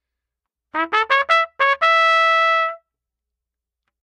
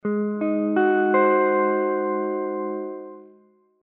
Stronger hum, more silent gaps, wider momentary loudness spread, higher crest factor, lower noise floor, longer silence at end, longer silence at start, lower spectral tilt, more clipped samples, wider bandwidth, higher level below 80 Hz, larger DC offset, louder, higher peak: neither; neither; second, 10 LU vs 13 LU; about the same, 18 dB vs 16 dB; first, -84 dBFS vs -57 dBFS; first, 1.25 s vs 0.6 s; first, 0.75 s vs 0.05 s; second, 0 dB/octave vs -6 dB/octave; neither; first, 9.8 kHz vs 3.9 kHz; first, -72 dBFS vs -80 dBFS; neither; first, -16 LUFS vs -22 LUFS; first, -2 dBFS vs -8 dBFS